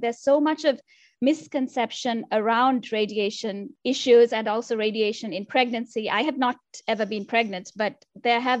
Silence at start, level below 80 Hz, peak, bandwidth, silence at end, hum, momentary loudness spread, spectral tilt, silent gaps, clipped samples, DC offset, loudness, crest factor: 0 s; -76 dBFS; -6 dBFS; 8.4 kHz; 0 s; none; 9 LU; -4 dB/octave; none; under 0.1%; under 0.1%; -24 LUFS; 18 dB